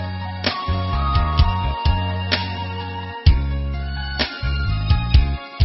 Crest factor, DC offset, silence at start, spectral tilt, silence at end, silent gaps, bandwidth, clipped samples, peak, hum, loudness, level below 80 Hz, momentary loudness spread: 18 dB; under 0.1%; 0 s; -9 dB/octave; 0 s; none; 5.8 kHz; under 0.1%; -2 dBFS; none; -21 LUFS; -22 dBFS; 8 LU